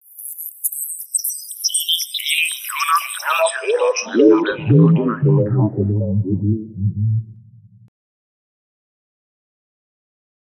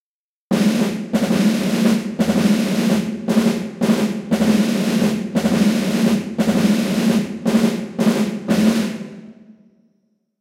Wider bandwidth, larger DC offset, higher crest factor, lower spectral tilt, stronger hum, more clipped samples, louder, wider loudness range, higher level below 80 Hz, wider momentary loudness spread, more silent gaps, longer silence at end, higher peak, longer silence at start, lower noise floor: about the same, 15.5 kHz vs 16 kHz; neither; about the same, 18 dB vs 14 dB; second, -4.5 dB/octave vs -6 dB/octave; neither; neither; about the same, -18 LUFS vs -18 LUFS; first, 10 LU vs 2 LU; second, -62 dBFS vs -54 dBFS; first, 10 LU vs 4 LU; neither; first, 3.1 s vs 0.9 s; about the same, -2 dBFS vs -4 dBFS; second, 0.15 s vs 0.5 s; second, -45 dBFS vs under -90 dBFS